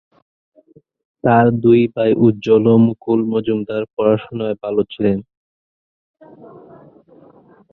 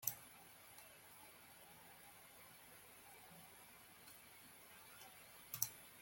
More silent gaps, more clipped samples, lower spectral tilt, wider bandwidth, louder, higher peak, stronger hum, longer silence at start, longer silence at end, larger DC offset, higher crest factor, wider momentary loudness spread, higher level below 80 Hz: first, 3.93-3.97 s vs none; neither; first, -9.5 dB/octave vs -1 dB/octave; second, 4.3 kHz vs 17 kHz; first, -16 LUFS vs -54 LUFS; first, -2 dBFS vs -20 dBFS; neither; first, 1.25 s vs 0 s; first, 2.5 s vs 0 s; neither; second, 16 dB vs 36 dB; second, 9 LU vs 16 LU; first, -54 dBFS vs -84 dBFS